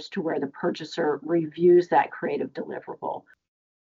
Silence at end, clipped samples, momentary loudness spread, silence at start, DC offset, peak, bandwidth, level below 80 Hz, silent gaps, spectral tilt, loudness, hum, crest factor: 0.6 s; under 0.1%; 15 LU; 0 s; under 0.1%; -8 dBFS; 7.4 kHz; -76 dBFS; none; -7 dB/octave; -25 LUFS; none; 18 dB